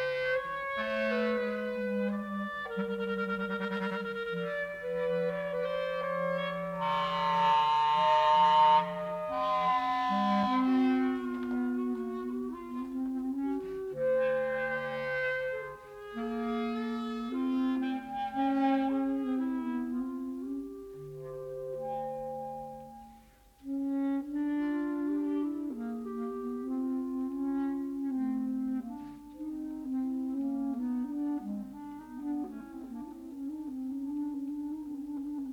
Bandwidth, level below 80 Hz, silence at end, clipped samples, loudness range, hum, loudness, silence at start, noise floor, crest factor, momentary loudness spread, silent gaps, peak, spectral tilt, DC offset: 14 kHz; -64 dBFS; 0 s; under 0.1%; 11 LU; none; -32 LUFS; 0 s; -58 dBFS; 18 dB; 13 LU; none; -14 dBFS; -6.5 dB/octave; under 0.1%